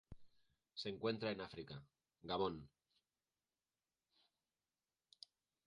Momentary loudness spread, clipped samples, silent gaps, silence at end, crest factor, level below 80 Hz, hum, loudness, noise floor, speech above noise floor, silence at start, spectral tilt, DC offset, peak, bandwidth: 21 LU; under 0.1%; none; 3 s; 24 dB; -74 dBFS; none; -46 LUFS; under -90 dBFS; over 45 dB; 0.1 s; -6 dB/octave; under 0.1%; -26 dBFS; 10 kHz